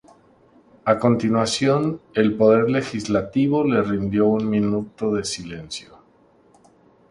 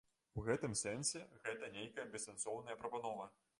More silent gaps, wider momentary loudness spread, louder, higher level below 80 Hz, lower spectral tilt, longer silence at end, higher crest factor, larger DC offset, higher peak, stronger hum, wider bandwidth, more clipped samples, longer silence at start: neither; about the same, 11 LU vs 9 LU; first, -20 LUFS vs -44 LUFS; first, -52 dBFS vs -68 dBFS; first, -6 dB/octave vs -3.5 dB/octave; first, 1.25 s vs 0.3 s; about the same, 18 dB vs 20 dB; neither; first, -2 dBFS vs -26 dBFS; neither; about the same, 11.5 kHz vs 11.5 kHz; neither; first, 0.85 s vs 0.35 s